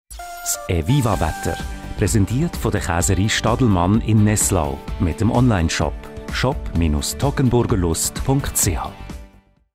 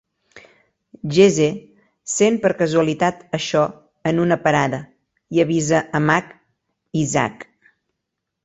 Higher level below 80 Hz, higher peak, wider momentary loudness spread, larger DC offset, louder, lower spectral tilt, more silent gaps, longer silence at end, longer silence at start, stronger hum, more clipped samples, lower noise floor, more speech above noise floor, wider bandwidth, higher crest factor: first, -30 dBFS vs -56 dBFS; second, -6 dBFS vs -2 dBFS; about the same, 11 LU vs 11 LU; neither; about the same, -19 LUFS vs -19 LUFS; about the same, -5 dB/octave vs -5 dB/octave; neither; second, 0.45 s vs 1 s; second, 0.1 s vs 0.35 s; neither; neither; second, -49 dBFS vs -79 dBFS; second, 31 dB vs 61 dB; first, 16 kHz vs 8.2 kHz; about the same, 14 dB vs 18 dB